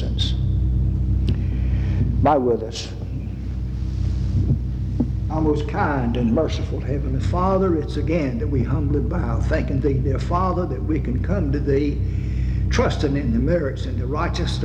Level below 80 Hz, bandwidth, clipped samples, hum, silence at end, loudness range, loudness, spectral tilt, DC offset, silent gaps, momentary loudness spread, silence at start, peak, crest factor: -26 dBFS; 8.2 kHz; under 0.1%; none; 0 s; 1 LU; -22 LUFS; -7.5 dB/octave; under 0.1%; none; 5 LU; 0 s; -4 dBFS; 16 dB